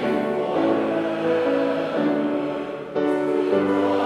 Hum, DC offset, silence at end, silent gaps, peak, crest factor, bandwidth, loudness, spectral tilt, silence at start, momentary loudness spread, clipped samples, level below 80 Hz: none; under 0.1%; 0 s; none; -8 dBFS; 14 dB; 11 kHz; -22 LUFS; -7 dB/octave; 0 s; 5 LU; under 0.1%; -66 dBFS